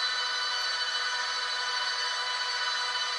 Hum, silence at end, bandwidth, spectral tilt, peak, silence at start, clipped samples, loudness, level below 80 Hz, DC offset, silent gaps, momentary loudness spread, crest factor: none; 0 s; 12 kHz; 3.5 dB/octave; -18 dBFS; 0 s; under 0.1%; -28 LUFS; -72 dBFS; under 0.1%; none; 1 LU; 14 dB